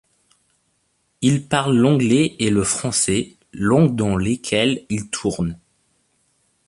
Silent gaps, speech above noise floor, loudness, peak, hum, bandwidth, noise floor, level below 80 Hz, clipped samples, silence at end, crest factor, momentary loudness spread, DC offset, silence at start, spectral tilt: none; 49 dB; -19 LUFS; -2 dBFS; none; 11.5 kHz; -67 dBFS; -46 dBFS; under 0.1%; 1.15 s; 18 dB; 9 LU; under 0.1%; 1.2 s; -5 dB/octave